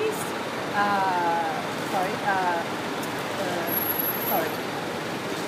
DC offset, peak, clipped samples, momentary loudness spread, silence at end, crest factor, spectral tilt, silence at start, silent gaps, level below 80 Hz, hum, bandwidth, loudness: under 0.1%; -12 dBFS; under 0.1%; 6 LU; 0 s; 16 dB; -4 dB/octave; 0 s; none; -66 dBFS; none; 15.5 kHz; -26 LUFS